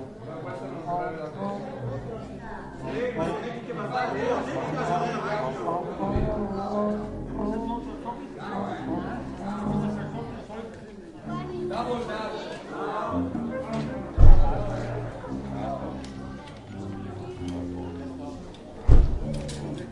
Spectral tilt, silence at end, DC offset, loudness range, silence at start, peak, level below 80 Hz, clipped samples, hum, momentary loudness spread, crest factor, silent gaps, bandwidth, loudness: -7.5 dB/octave; 0 s; under 0.1%; 6 LU; 0 s; -2 dBFS; -28 dBFS; under 0.1%; none; 11 LU; 24 dB; none; 8.4 kHz; -30 LUFS